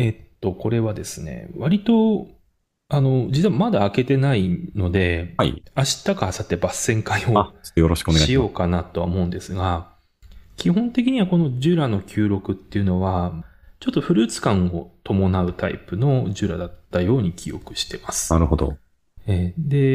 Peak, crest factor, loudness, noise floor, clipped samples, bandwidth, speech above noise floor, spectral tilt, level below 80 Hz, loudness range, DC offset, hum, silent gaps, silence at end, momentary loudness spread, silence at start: -2 dBFS; 20 dB; -21 LUFS; -65 dBFS; under 0.1%; 15.5 kHz; 45 dB; -6 dB/octave; -40 dBFS; 3 LU; under 0.1%; none; none; 0 s; 9 LU; 0 s